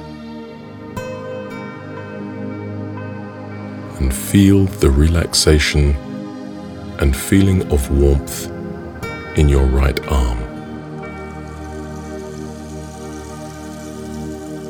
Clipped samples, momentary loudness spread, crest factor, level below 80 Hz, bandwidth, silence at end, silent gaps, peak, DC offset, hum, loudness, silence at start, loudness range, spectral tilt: under 0.1%; 17 LU; 18 dB; -24 dBFS; 20 kHz; 0 s; none; 0 dBFS; under 0.1%; none; -18 LUFS; 0 s; 14 LU; -5.5 dB/octave